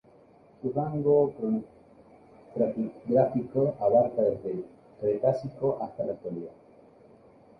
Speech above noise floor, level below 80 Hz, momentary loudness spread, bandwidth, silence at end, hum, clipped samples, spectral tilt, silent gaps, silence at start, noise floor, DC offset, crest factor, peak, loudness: 30 dB; -64 dBFS; 14 LU; 5.8 kHz; 1.1 s; none; under 0.1%; -11 dB/octave; none; 0.65 s; -57 dBFS; under 0.1%; 18 dB; -10 dBFS; -28 LUFS